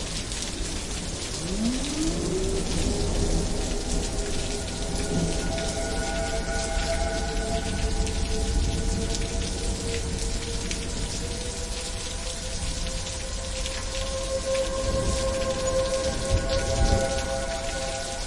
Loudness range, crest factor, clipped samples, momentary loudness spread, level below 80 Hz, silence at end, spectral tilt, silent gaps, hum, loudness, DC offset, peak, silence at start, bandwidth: 4 LU; 18 dB; under 0.1%; 5 LU; -30 dBFS; 0 s; -4 dB/octave; none; none; -28 LUFS; under 0.1%; -10 dBFS; 0 s; 11.5 kHz